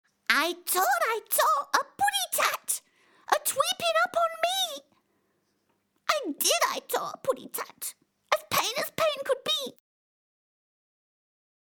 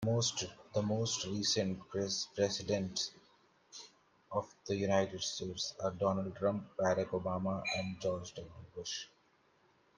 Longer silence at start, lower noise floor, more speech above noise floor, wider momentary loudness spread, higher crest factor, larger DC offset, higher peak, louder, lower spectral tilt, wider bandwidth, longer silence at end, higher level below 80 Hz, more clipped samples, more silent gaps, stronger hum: first, 0.3 s vs 0 s; about the same, -73 dBFS vs -71 dBFS; first, 45 dB vs 35 dB; second, 9 LU vs 14 LU; first, 26 dB vs 20 dB; neither; first, -4 dBFS vs -16 dBFS; first, -27 LUFS vs -36 LUFS; second, 0 dB/octave vs -4 dB/octave; first, over 20 kHz vs 10.5 kHz; first, 2.1 s vs 0.9 s; about the same, -74 dBFS vs -70 dBFS; neither; neither; neither